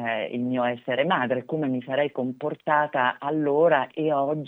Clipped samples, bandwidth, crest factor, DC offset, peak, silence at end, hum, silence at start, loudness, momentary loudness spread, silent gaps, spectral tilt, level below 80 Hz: under 0.1%; 4 kHz; 18 dB; under 0.1%; -8 dBFS; 0 s; none; 0 s; -25 LUFS; 6 LU; none; -8.5 dB/octave; -78 dBFS